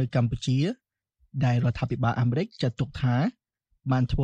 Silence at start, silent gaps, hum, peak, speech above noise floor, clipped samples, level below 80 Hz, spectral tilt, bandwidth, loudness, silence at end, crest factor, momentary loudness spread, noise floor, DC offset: 0 s; none; none; -12 dBFS; 42 dB; under 0.1%; -44 dBFS; -7.5 dB/octave; 8.4 kHz; -27 LUFS; 0 s; 14 dB; 6 LU; -67 dBFS; under 0.1%